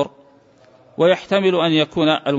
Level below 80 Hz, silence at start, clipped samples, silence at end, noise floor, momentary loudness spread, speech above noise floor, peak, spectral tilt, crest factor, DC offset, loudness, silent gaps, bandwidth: -60 dBFS; 0 s; under 0.1%; 0 s; -51 dBFS; 7 LU; 34 dB; -4 dBFS; -6 dB/octave; 14 dB; under 0.1%; -17 LUFS; none; 7.8 kHz